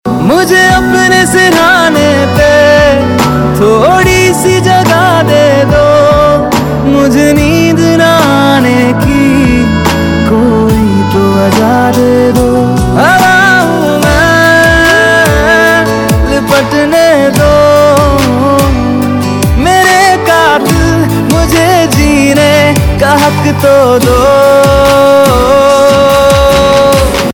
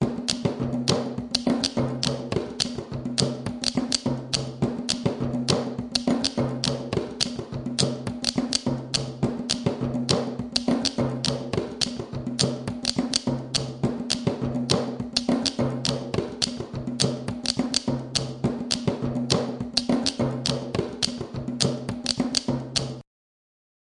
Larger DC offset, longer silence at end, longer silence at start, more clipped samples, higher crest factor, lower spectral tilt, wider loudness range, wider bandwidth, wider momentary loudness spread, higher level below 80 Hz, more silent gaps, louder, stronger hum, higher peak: neither; second, 0 s vs 0.8 s; about the same, 0.05 s vs 0 s; first, 2% vs under 0.1%; second, 6 dB vs 26 dB; about the same, -5 dB/octave vs -4 dB/octave; about the same, 2 LU vs 1 LU; first, 19 kHz vs 11.5 kHz; about the same, 4 LU vs 5 LU; first, -20 dBFS vs -50 dBFS; neither; first, -6 LUFS vs -26 LUFS; neither; about the same, 0 dBFS vs 0 dBFS